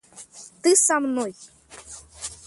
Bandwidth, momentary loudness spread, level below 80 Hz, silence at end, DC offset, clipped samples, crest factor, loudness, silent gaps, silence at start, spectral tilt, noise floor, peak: 12 kHz; 24 LU; -60 dBFS; 0.1 s; under 0.1%; under 0.1%; 20 dB; -20 LUFS; none; 0.15 s; -1.5 dB/octave; -45 dBFS; -4 dBFS